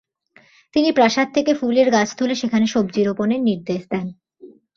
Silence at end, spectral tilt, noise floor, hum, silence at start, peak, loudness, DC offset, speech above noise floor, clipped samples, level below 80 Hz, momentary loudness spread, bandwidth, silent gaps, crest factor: 0.3 s; -5 dB/octave; -54 dBFS; none; 0.75 s; -2 dBFS; -19 LUFS; under 0.1%; 36 dB; under 0.1%; -60 dBFS; 9 LU; 7.4 kHz; none; 16 dB